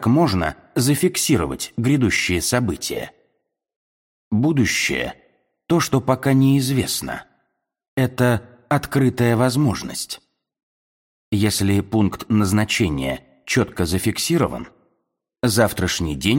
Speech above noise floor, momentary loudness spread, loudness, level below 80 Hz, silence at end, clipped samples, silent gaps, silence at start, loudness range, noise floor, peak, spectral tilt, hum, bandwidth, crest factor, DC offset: 54 dB; 9 LU; -20 LUFS; -44 dBFS; 0 s; under 0.1%; 3.76-4.31 s, 7.88-7.97 s, 10.63-11.32 s; 0 s; 2 LU; -73 dBFS; -2 dBFS; -5 dB/octave; none; 17 kHz; 18 dB; under 0.1%